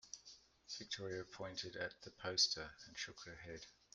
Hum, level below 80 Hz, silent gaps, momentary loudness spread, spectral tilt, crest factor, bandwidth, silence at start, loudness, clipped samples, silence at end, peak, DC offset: none; -74 dBFS; none; 19 LU; -1.5 dB/octave; 24 dB; 11.5 kHz; 0.05 s; -43 LUFS; under 0.1%; 0.2 s; -22 dBFS; under 0.1%